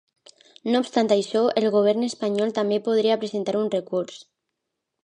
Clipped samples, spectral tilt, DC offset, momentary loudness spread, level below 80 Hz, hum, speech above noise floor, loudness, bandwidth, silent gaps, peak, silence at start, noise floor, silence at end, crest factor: under 0.1%; -5.5 dB/octave; under 0.1%; 7 LU; -76 dBFS; none; 59 dB; -23 LUFS; 10.5 kHz; none; -6 dBFS; 0.65 s; -81 dBFS; 0.85 s; 18 dB